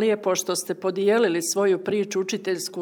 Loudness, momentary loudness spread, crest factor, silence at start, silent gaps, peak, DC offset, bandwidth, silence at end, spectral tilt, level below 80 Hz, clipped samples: -23 LUFS; 6 LU; 14 dB; 0 s; none; -10 dBFS; under 0.1%; 20 kHz; 0 s; -3.5 dB/octave; -78 dBFS; under 0.1%